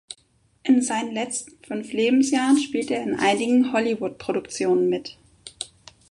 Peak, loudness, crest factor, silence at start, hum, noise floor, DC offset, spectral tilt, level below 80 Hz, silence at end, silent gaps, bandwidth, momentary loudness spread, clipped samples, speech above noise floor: -8 dBFS; -23 LUFS; 16 dB; 0.1 s; none; -63 dBFS; under 0.1%; -4 dB/octave; -64 dBFS; 0.45 s; none; 11.5 kHz; 16 LU; under 0.1%; 40 dB